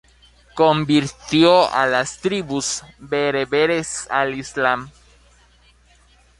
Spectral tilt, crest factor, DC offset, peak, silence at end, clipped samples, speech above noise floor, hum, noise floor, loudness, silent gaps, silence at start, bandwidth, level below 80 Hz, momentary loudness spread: -4 dB/octave; 18 dB; under 0.1%; -2 dBFS; 1.5 s; under 0.1%; 35 dB; 60 Hz at -50 dBFS; -54 dBFS; -19 LUFS; none; 0.55 s; 11.5 kHz; -52 dBFS; 10 LU